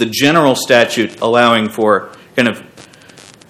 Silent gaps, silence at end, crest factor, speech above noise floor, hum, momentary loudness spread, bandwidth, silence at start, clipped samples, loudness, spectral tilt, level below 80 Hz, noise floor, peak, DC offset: none; 0.7 s; 14 dB; 28 dB; none; 6 LU; 16 kHz; 0 s; 0.4%; -13 LUFS; -4 dB/octave; -58 dBFS; -40 dBFS; 0 dBFS; under 0.1%